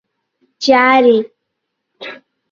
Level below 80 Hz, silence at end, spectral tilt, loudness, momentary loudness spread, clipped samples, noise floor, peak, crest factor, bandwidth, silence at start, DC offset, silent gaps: -62 dBFS; 0.4 s; -3.5 dB/octave; -12 LUFS; 22 LU; under 0.1%; -74 dBFS; 0 dBFS; 16 dB; 7.4 kHz; 0.6 s; under 0.1%; none